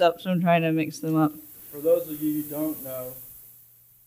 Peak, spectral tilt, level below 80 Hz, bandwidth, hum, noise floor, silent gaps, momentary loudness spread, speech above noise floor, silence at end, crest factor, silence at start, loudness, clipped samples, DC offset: -8 dBFS; -6.5 dB/octave; -66 dBFS; 16.5 kHz; none; -55 dBFS; none; 18 LU; 30 dB; 0.55 s; 18 dB; 0 s; -25 LUFS; under 0.1%; under 0.1%